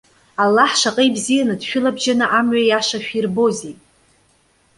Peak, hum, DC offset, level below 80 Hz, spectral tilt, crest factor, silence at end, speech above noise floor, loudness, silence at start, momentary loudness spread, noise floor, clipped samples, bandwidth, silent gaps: -2 dBFS; none; under 0.1%; -60 dBFS; -3 dB/octave; 16 dB; 1.05 s; 41 dB; -17 LUFS; 0.4 s; 7 LU; -58 dBFS; under 0.1%; 11.5 kHz; none